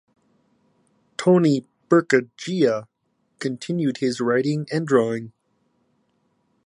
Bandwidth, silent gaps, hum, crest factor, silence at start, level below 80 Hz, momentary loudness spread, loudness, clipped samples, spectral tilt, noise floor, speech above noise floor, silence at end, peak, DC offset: 11 kHz; none; none; 22 dB; 1.2 s; -72 dBFS; 12 LU; -22 LUFS; under 0.1%; -6.5 dB/octave; -68 dBFS; 48 dB; 1.35 s; -2 dBFS; under 0.1%